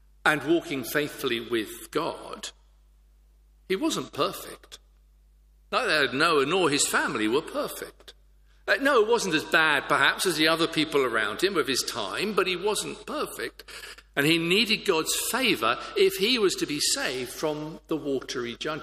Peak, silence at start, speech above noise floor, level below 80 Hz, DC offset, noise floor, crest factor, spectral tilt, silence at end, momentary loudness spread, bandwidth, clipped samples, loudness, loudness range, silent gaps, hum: -6 dBFS; 0.25 s; 31 dB; -58 dBFS; under 0.1%; -58 dBFS; 22 dB; -2.5 dB/octave; 0 s; 12 LU; 15.5 kHz; under 0.1%; -25 LUFS; 9 LU; none; none